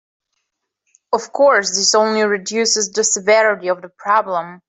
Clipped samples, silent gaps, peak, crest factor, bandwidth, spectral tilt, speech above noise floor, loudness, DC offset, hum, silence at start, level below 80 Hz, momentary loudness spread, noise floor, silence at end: under 0.1%; none; -2 dBFS; 16 dB; 8.4 kHz; -1 dB/octave; 59 dB; -16 LUFS; under 0.1%; none; 1.1 s; -68 dBFS; 9 LU; -75 dBFS; 0.1 s